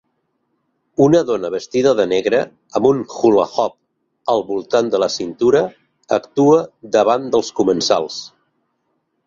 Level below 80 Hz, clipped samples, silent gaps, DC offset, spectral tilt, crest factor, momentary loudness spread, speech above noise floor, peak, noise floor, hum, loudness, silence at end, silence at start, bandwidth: -58 dBFS; under 0.1%; none; under 0.1%; -5 dB/octave; 16 dB; 8 LU; 53 dB; -2 dBFS; -69 dBFS; none; -17 LUFS; 1 s; 1 s; 7.6 kHz